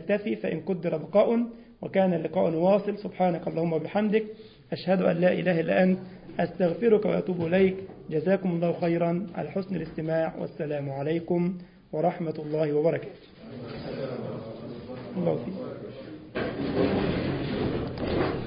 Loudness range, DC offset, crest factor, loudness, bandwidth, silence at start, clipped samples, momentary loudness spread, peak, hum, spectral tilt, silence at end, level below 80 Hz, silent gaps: 6 LU; under 0.1%; 18 dB; -27 LUFS; 5.2 kHz; 0 s; under 0.1%; 15 LU; -8 dBFS; none; -11.5 dB/octave; 0 s; -52 dBFS; none